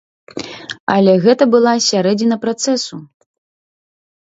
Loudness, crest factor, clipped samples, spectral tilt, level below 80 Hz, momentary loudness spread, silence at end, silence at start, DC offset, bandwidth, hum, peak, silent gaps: -14 LUFS; 16 dB; under 0.1%; -4.5 dB/octave; -62 dBFS; 17 LU; 1.15 s; 0.35 s; under 0.1%; 8 kHz; none; 0 dBFS; 0.80-0.87 s